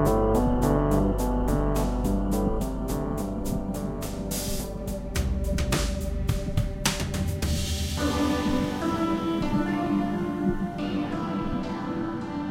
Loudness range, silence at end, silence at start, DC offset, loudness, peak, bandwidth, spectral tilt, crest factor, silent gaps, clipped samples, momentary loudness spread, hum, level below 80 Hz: 3 LU; 0 s; 0 s; under 0.1%; -27 LUFS; -8 dBFS; 16.5 kHz; -5.5 dB/octave; 18 dB; none; under 0.1%; 7 LU; none; -32 dBFS